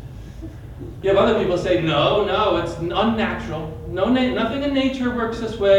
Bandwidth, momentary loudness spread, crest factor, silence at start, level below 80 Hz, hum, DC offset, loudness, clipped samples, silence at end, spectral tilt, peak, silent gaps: 10.5 kHz; 18 LU; 16 dB; 0 s; -40 dBFS; none; under 0.1%; -20 LUFS; under 0.1%; 0 s; -6.5 dB/octave; -4 dBFS; none